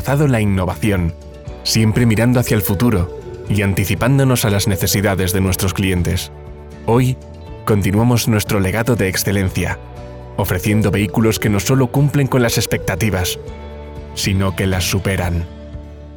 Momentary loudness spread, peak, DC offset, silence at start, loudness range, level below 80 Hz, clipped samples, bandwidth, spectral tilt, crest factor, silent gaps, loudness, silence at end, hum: 15 LU; -4 dBFS; 0.3%; 0 s; 2 LU; -36 dBFS; under 0.1%; over 20 kHz; -5.5 dB/octave; 14 dB; none; -16 LUFS; 0 s; none